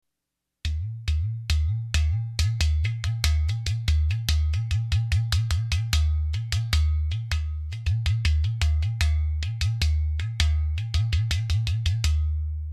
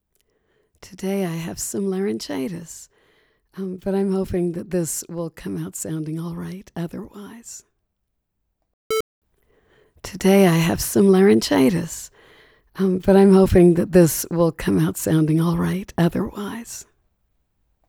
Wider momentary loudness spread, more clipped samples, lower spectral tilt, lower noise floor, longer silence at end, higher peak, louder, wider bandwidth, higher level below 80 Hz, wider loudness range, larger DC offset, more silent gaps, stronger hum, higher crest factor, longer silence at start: second, 4 LU vs 21 LU; neither; second, -4 dB/octave vs -6 dB/octave; first, -83 dBFS vs -76 dBFS; second, 0 s vs 1.05 s; about the same, -4 dBFS vs -4 dBFS; second, -26 LUFS vs -20 LUFS; second, 13.5 kHz vs over 20 kHz; first, -28 dBFS vs -44 dBFS; second, 1 LU vs 15 LU; neither; second, none vs 8.73-8.90 s, 9.00-9.22 s; neither; about the same, 20 dB vs 18 dB; second, 0.65 s vs 0.85 s